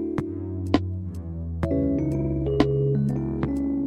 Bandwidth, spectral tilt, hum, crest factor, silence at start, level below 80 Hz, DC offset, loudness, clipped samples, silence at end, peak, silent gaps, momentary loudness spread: 8.4 kHz; -9 dB/octave; none; 20 dB; 0 s; -38 dBFS; under 0.1%; -26 LUFS; under 0.1%; 0 s; -4 dBFS; none; 10 LU